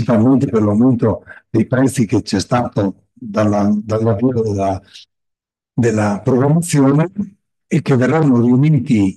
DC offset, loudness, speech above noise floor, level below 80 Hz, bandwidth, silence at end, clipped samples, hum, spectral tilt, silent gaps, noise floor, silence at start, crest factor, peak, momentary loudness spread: under 0.1%; -15 LUFS; 66 dB; -54 dBFS; 12.5 kHz; 0.05 s; under 0.1%; none; -7.5 dB/octave; none; -80 dBFS; 0 s; 12 dB; -4 dBFS; 8 LU